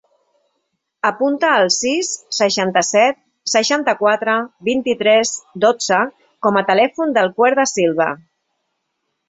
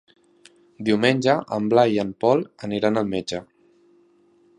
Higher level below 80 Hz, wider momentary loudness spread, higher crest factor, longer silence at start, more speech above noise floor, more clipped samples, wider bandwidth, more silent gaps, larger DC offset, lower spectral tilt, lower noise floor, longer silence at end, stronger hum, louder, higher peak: about the same, -64 dBFS vs -60 dBFS; second, 7 LU vs 10 LU; about the same, 16 dB vs 20 dB; first, 1.05 s vs 0.8 s; first, 57 dB vs 37 dB; neither; second, 8.4 kHz vs 10.5 kHz; neither; neither; second, -2.5 dB/octave vs -6 dB/octave; first, -73 dBFS vs -58 dBFS; about the same, 1.15 s vs 1.15 s; neither; first, -16 LUFS vs -22 LUFS; about the same, -2 dBFS vs -2 dBFS